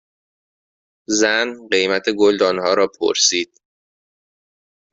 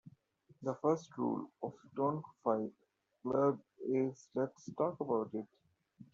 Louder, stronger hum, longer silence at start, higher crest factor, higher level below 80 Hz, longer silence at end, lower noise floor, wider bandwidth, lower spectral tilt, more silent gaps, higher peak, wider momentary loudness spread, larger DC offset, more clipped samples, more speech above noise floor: first, -17 LUFS vs -38 LUFS; neither; first, 1.1 s vs 0.05 s; about the same, 20 dB vs 18 dB; first, -62 dBFS vs -80 dBFS; first, 1.45 s vs 0.1 s; first, under -90 dBFS vs -68 dBFS; about the same, 8 kHz vs 7.6 kHz; second, -1.5 dB/octave vs -8.5 dB/octave; neither; first, -2 dBFS vs -20 dBFS; second, 5 LU vs 12 LU; neither; neither; first, over 73 dB vs 31 dB